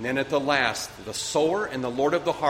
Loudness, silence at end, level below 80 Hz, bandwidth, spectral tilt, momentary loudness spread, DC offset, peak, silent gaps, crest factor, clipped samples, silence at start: -25 LUFS; 0 s; -58 dBFS; 16 kHz; -3.5 dB/octave; 8 LU; under 0.1%; -6 dBFS; none; 18 dB; under 0.1%; 0 s